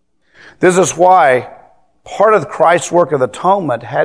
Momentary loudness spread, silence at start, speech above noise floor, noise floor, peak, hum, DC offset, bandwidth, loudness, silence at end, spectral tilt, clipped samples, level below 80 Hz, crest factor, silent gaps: 7 LU; 0.6 s; 33 dB; -44 dBFS; 0 dBFS; none; 0.2%; 11 kHz; -12 LUFS; 0 s; -4.5 dB/octave; 0.3%; -56 dBFS; 12 dB; none